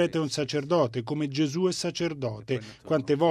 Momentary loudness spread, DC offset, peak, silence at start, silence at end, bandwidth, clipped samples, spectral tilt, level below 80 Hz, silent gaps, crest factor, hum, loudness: 7 LU; under 0.1%; -10 dBFS; 0 s; 0 s; 13.5 kHz; under 0.1%; -5.5 dB/octave; -66 dBFS; none; 16 dB; none; -28 LUFS